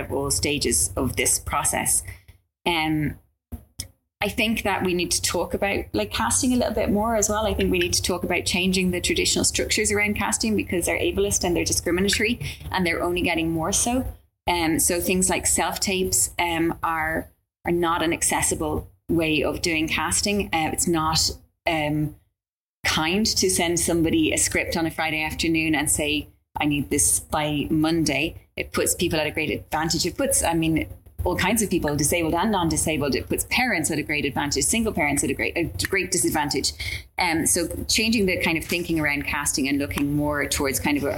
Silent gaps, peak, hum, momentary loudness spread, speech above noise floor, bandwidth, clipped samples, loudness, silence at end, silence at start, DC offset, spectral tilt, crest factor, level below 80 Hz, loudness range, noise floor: 22.53-22.83 s; -6 dBFS; none; 7 LU; over 67 dB; 17 kHz; under 0.1%; -22 LUFS; 0 s; 0 s; under 0.1%; -3 dB/octave; 16 dB; -40 dBFS; 2 LU; under -90 dBFS